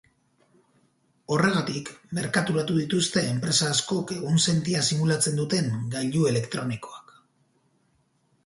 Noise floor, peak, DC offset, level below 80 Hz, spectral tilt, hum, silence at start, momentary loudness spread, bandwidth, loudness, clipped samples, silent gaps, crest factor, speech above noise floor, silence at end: -68 dBFS; -8 dBFS; under 0.1%; -62 dBFS; -4 dB/octave; none; 1.3 s; 10 LU; 11.5 kHz; -25 LUFS; under 0.1%; none; 18 dB; 43 dB; 1.45 s